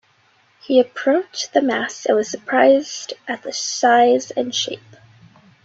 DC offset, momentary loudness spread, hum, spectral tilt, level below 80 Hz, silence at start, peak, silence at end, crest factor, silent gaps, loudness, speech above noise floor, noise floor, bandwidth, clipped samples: under 0.1%; 13 LU; none; -2.5 dB/octave; -68 dBFS; 0.7 s; -2 dBFS; 0.85 s; 18 dB; none; -18 LUFS; 40 dB; -58 dBFS; 8 kHz; under 0.1%